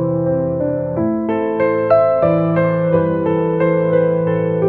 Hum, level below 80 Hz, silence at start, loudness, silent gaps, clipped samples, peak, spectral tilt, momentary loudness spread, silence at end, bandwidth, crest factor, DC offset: none; -52 dBFS; 0 s; -16 LUFS; none; under 0.1%; -2 dBFS; -11.5 dB/octave; 5 LU; 0 s; 4.4 kHz; 14 dB; 0.2%